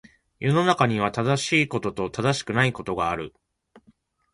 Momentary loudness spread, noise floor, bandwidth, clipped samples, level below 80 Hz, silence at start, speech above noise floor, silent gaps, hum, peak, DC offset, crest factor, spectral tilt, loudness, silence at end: 8 LU; -62 dBFS; 11.5 kHz; under 0.1%; -54 dBFS; 0.4 s; 38 dB; none; none; -6 dBFS; under 0.1%; 20 dB; -5 dB/octave; -23 LUFS; 0.55 s